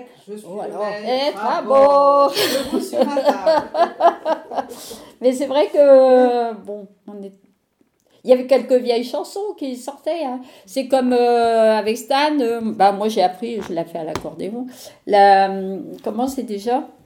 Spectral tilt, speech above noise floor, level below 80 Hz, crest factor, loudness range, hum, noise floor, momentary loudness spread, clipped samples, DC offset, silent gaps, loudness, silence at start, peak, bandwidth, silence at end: -4.5 dB/octave; 46 dB; -60 dBFS; 18 dB; 5 LU; none; -63 dBFS; 19 LU; under 0.1%; under 0.1%; none; -18 LUFS; 0 s; 0 dBFS; 18 kHz; 0.2 s